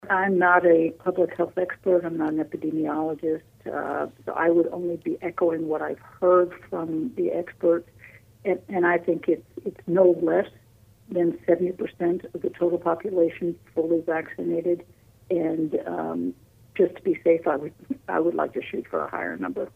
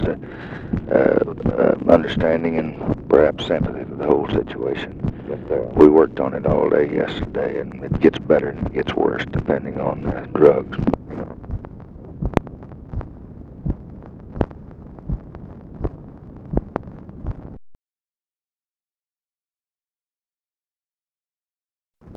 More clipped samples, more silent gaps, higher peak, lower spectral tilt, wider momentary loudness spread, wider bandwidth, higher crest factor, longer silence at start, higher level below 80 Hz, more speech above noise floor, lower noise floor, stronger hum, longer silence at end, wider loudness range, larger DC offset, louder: neither; second, none vs 21.02-21.06 s, 21.50-21.54 s; second, -6 dBFS vs 0 dBFS; about the same, -8.5 dB/octave vs -8.5 dB/octave; second, 11 LU vs 22 LU; second, 3.7 kHz vs 7.4 kHz; about the same, 20 dB vs 20 dB; about the same, 0.05 s vs 0 s; second, -64 dBFS vs -36 dBFS; second, 30 dB vs over 72 dB; second, -54 dBFS vs under -90 dBFS; neither; about the same, 0.05 s vs 0 s; second, 3 LU vs 15 LU; neither; second, -25 LUFS vs -20 LUFS